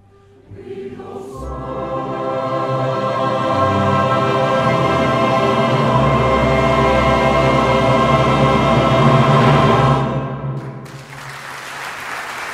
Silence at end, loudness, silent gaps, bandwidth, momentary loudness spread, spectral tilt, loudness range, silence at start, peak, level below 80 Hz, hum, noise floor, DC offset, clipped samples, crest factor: 0 s; -15 LUFS; none; 13 kHz; 18 LU; -6.5 dB/octave; 6 LU; 0.5 s; 0 dBFS; -34 dBFS; none; -46 dBFS; under 0.1%; under 0.1%; 14 dB